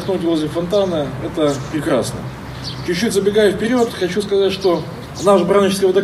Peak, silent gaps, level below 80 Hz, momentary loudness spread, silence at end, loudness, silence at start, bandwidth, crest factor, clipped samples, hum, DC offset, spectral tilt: -2 dBFS; none; -42 dBFS; 11 LU; 0 s; -17 LUFS; 0 s; 15 kHz; 16 dB; under 0.1%; none; under 0.1%; -5.5 dB/octave